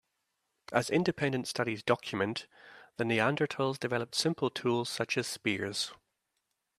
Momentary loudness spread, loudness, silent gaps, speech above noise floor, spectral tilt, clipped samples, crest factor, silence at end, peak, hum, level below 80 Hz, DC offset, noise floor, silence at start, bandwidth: 6 LU; -32 LUFS; none; 51 dB; -4.5 dB/octave; under 0.1%; 24 dB; 0.85 s; -10 dBFS; none; -72 dBFS; under 0.1%; -83 dBFS; 0.7 s; 15 kHz